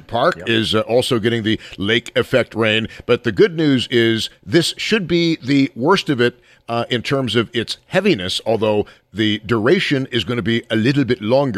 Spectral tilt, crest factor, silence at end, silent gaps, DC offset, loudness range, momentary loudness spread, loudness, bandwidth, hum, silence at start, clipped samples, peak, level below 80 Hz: -5.5 dB/octave; 14 dB; 0 s; none; under 0.1%; 2 LU; 5 LU; -17 LUFS; 14.5 kHz; none; 0.1 s; under 0.1%; -2 dBFS; -50 dBFS